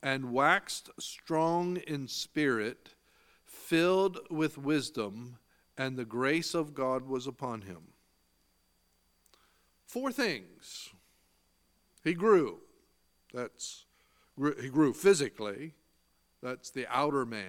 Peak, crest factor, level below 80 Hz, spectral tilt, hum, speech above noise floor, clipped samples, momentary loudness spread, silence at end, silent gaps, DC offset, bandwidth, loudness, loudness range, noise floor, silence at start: -10 dBFS; 24 dB; -74 dBFS; -4.5 dB/octave; none; 41 dB; under 0.1%; 19 LU; 0 s; none; under 0.1%; 18 kHz; -32 LUFS; 8 LU; -73 dBFS; 0 s